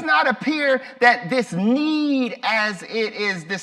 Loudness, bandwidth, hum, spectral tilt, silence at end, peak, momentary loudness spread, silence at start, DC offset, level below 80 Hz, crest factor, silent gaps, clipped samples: -20 LUFS; 12 kHz; none; -5 dB/octave; 0 s; -4 dBFS; 7 LU; 0 s; under 0.1%; -72 dBFS; 18 dB; none; under 0.1%